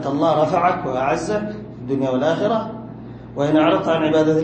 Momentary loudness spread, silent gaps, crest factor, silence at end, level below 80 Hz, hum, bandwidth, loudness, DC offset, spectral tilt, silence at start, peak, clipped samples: 15 LU; none; 14 dB; 0 s; -50 dBFS; none; 8.8 kHz; -19 LUFS; under 0.1%; -6.5 dB/octave; 0 s; -4 dBFS; under 0.1%